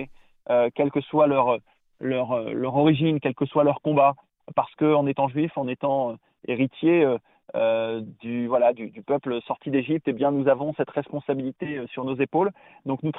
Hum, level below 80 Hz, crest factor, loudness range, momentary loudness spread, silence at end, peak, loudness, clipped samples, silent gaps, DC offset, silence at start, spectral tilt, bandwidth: none; -66 dBFS; 16 dB; 3 LU; 11 LU; 0 s; -8 dBFS; -24 LUFS; under 0.1%; none; under 0.1%; 0 s; -11 dB/octave; 4 kHz